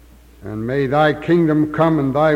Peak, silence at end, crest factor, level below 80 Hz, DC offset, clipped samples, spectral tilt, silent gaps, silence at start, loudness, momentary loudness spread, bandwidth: -2 dBFS; 0 s; 14 dB; -44 dBFS; under 0.1%; under 0.1%; -8.5 dB/octave; none; 0.4 s; -17 LUFS; 12 LU; 9.2 kHz